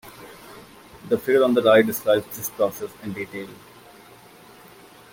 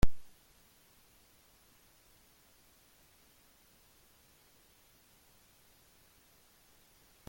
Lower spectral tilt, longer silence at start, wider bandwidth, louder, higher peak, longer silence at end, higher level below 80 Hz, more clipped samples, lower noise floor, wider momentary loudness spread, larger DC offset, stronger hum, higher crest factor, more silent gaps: about the same, -4.5 dB/octave vs -5.5 dB/octave; about the same, 0.05 s vs 0.05 s; about the same, 17 kHz vs 17 kHz; first, -21 LUFS vs -56 LUFS; first, -4 dBFS vs -12 dBFS; second, 1.6 s vs 7.05 s; second, -62 dBFS vs -48 dBFS; neither; second, -48 dBFS vs -65 dBFS; first, 26 LU vs 0 LU; neither; neither; second, 20 dB vs 26 dB; neither